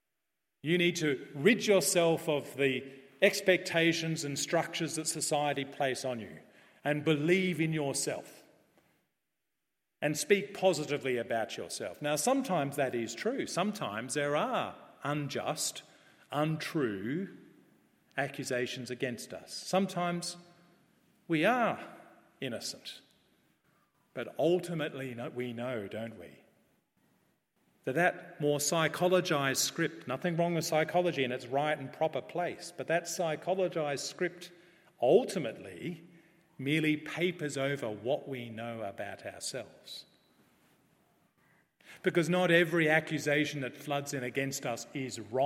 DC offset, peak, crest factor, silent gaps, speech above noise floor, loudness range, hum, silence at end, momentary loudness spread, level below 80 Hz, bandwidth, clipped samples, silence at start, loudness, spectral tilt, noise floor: under 0.1%; -10 dBFS; 24 dB; none; 54 dB; 7 LU; none; 0 s; 14 LU; -80 dBFS; 16.5 kHz; under 0.1%; 0.65 s; -32 LUFS; -4 dB/octave; -86 dBFS